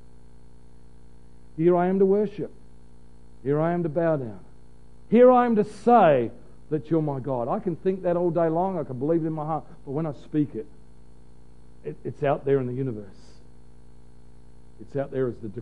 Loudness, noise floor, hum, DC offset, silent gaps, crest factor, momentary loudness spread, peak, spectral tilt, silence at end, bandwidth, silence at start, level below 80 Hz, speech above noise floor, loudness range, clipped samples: -24 LUFS; -52 dBFS; 60 Hz at -50 dBFS; 0.8%; none; 20 dB; 18 LU; -6 dBFS; -9.5 dB/octave; 0 s; 10 kHz; 1.55 s; -54 dBFS; 29 dB; 9 LU; under 0.1%